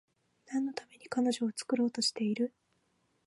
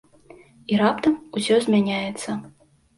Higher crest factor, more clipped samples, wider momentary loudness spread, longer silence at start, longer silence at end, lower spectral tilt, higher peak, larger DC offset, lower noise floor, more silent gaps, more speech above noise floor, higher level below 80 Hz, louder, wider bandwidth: about the same, 16 dB vs 16 dB; neither; second, 8 LU vs 12 LU; second, 0.5 s vs 0.7 s; first, 0.8 s vs 0.5 s; second, -3.5 dB/octave vs -5.5 dB/octave; second, -20 dBFS vs -8 dBFS; neither; first, -75 dBFS vs -50 dBFS; neither; first, 43 dB vs 28 dB; second, -84 dBFS vs -62 dBFS; second, -33 LUFS vs -22 LUFS; about the same, 11.5 kHz vs 11.5 kHz